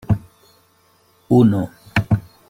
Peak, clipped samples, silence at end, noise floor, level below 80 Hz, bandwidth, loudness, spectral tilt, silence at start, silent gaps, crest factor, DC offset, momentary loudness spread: -4 dBFS; under 0.1%; 0.3 s; -57 dBFS; -44 dBFS; 16 kHz; -18 LUFS; -8.5 dB/octave; 0.1 s; none; 16 dB; under 0.1%; 9 LU